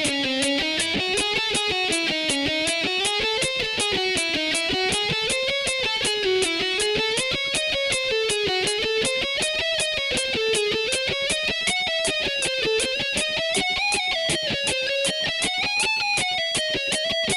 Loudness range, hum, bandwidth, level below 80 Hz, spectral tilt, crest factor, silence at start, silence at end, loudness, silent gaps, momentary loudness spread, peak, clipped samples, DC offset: 0 LU; none; 14 kHz; -50 dBFS; -1.5 dB/octave; 16 dB; 0 s; 0 s; -22 LUFS; none; 1 LU; -8 dBFS; under 0.1%; under 0.1%